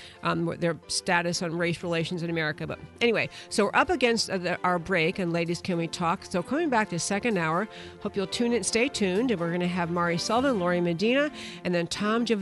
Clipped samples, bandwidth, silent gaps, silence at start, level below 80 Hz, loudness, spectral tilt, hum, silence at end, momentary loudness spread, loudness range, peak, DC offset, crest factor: under 0.1%; 11.5 kHz; none; 0 s; -58 dBFS; -27 LUFS; -4.5 dB/octave; none; 0 s; 6 LU; 2 LU; -8 dBFS; under 0.1%; 18 dB